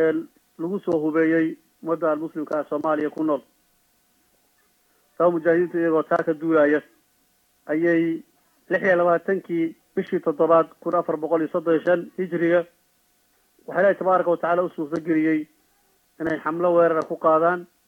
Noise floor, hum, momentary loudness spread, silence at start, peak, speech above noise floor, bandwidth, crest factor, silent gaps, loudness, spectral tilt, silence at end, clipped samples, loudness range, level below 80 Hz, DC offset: -65 dBFS; none; 10 LU; 0 s; -6 dBFS; 43 dB; 6.4 kHz; 16 dB; none; -22 LUFS; -8.5 dB/octave; 0.2 s; under 0.1%; 3 LU; -74 dBFS; under 0.1%